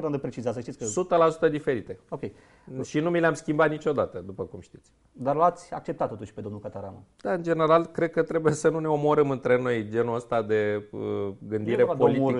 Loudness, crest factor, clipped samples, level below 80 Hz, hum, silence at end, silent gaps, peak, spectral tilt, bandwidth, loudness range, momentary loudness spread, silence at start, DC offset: -26 LUFS; 18 dB; under 0.1%; -62 dBFS; none; 0 s; none; -8 dBFS; -6.5 dB/octave; 11 kHz; 5 LU; 15 LU; 0 s; under 0.1%